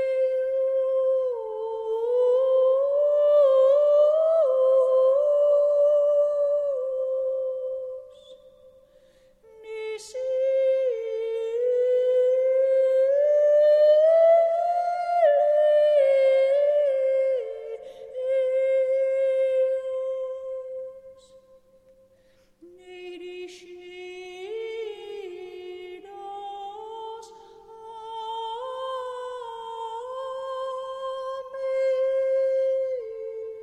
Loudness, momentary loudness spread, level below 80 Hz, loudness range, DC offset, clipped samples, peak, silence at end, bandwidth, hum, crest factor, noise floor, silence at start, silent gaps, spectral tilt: -23 LUFS; 20 LU; -72 dBFS; 18 LU; under 0.1%; under 0.1%; -10 dBFS; 0 s; 8.6 kHz; none; 12 dB; -60 dBFS; 0 s; none; -3 dB/octave